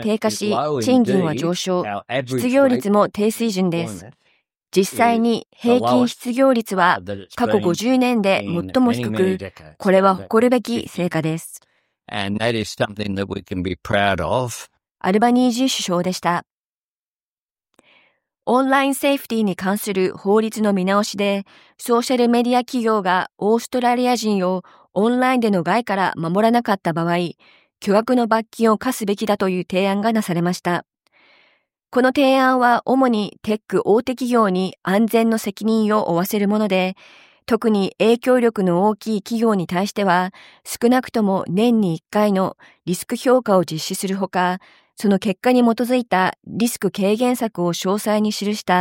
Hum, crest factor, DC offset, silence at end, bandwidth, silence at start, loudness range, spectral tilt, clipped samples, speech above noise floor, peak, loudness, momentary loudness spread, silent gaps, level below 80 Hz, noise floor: none; 18 dB; under 0.1%; 0 s; 17 kHz; 0 s; 3 LU; -5.5 dB/octave; under 0.1%; over 72 dB; -2 dBFS; -19 LUFS; 8 LU; 16.53-17.17 s, 17.23-17.55 s; -58 dBFS; under -90 dBFS